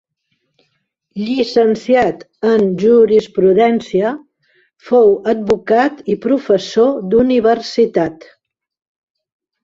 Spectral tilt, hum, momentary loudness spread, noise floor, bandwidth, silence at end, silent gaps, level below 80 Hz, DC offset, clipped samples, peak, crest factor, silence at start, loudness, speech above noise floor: -6.5 dB/octave; none; 9 LU; -68 dBFS; 7.6 kHz; 1.5 s; none; -52 dBFS; under 0.1%; under 0.1%; -2 dBFS; 14 dB; 1.15 s; -14 LUFS; 55 dB